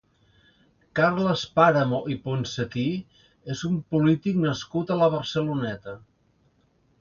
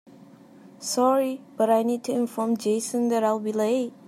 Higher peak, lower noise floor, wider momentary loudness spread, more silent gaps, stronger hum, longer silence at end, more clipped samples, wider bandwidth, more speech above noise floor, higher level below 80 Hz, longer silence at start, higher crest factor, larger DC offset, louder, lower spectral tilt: first, -4 dBFS vs -8 dBFS; first, -65 dBFS vs -49 dBFS; first, 14 LU vs 5 LU; neither; neither; first, 1.05 s vs 0.15 s; neither; second, 7.2 kHz vs 15.5 kHz; first, 41 dB vs 26 dB; first, -58 dBFS vs -82 dBFS; first, 0.95 s vs 0.65 s; first, 22 dB vs 16 dB; neither; about the same, -25 LUFS vs -24 LUFS; first, -6.5 dB/octave vs -4.5 dB/octave